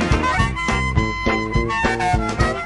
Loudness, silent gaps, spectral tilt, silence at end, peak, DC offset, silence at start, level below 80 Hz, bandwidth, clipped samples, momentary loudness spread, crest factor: -19 LUFS; none; -5.5 dB/octave; 0 s; -4 dBFS; 0.3%; 0 s; -26 dBFS; 11.5 kHz; under 0.1%; 2 LU; 14 dB